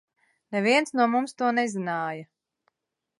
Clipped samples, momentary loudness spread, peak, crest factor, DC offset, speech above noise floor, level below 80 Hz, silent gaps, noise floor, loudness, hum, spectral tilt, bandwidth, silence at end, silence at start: under 0.1%; 10 LU; -8 dBFS; 20 dB; under 0.1%; 60 dB; -82 dBFS; none; -85 dBFS; -25 LUFS; none; -4.5 dB/octave; 11.5 kHz; 0.95 s; 0.5 s